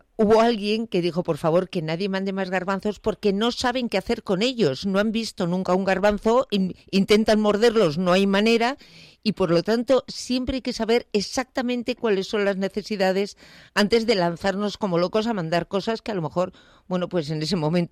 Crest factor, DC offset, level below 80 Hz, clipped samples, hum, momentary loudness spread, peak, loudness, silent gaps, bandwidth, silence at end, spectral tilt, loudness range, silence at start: 14 dB; under 0.1%; -50 dBFS; under 0.1%; none; 8 LU; -10 dBFS; -23 LUFS; none; 14.5 kHz; 0.05 s; -5.5 dB/octave; 4 LU; 0.2 s